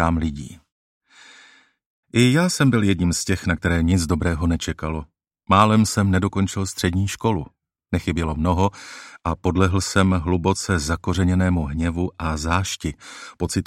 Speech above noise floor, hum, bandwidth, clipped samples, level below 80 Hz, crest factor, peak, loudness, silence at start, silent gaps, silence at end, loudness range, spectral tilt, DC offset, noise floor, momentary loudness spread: 32 dB; none; 15.5 kHz; under 0.1%; -36 dBFS; 20 dB; -2 dBFS; -21 LUFS; 0 s; 0.72-1.01 s, 1.86-2.03 s; 0.05 s; 3 LU; -5.5 dB/octave; under 0.1%; -52 dBFS; 11 LU